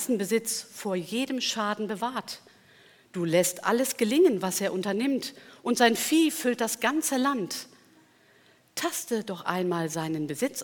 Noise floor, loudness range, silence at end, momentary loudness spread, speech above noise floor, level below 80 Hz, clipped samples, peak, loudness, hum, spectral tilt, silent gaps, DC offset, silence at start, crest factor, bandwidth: -60 dBFS; 6 LU; 0 s; 12 LU; 33 dB; -78 dBFS; under 0.1%; -6 dBFS; -27 LUFS; none; -3.5 dB/octave; none; under 0.1%; 0 s; 22 dB; 19 kHz